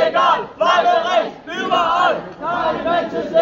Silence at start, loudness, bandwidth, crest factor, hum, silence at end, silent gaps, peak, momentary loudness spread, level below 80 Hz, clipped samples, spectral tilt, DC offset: 0 s; -17 LUFS; 7.6 kHz; 14 dB; none; 0 s; none; -2 dBFS; 9 LU; -54 dBFS; under 0.1%; -4 dB/octave; under 0.1%